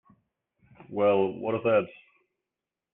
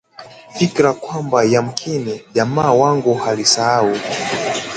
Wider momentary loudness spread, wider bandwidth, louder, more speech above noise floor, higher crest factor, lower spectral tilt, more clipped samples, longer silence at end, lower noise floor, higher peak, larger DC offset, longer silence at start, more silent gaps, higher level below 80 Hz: first, 12 LU vs 8 LU; second, 3.8 kHz vs 9.4 kHz; second, -26 LUFS vs -16 LUFS; first, 63 dB vs 23 dB; about the same, 18 dB vs 16 dB; first, -10 dB/octave vs -4 dB/octave; neither; first, 1.05 s vs 0 s; first, -89 dBFS vs -39 dBFS; second, -12 dBFS vs 0 dBFS; neither; first, 0.9 s vs 0.2 s; neither; second, -72 dBFS vs -56 dBFS